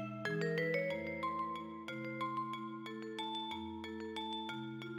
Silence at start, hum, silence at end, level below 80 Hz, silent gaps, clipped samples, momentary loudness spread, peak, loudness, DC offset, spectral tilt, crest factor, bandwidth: 0 s; none; 0 s; -74 dBFS; none; under 0.1%; 9 LU; -24 dBFS; -41 LUFS; under 0.1%; -6 dB/octave; 16 dB; 19 kHz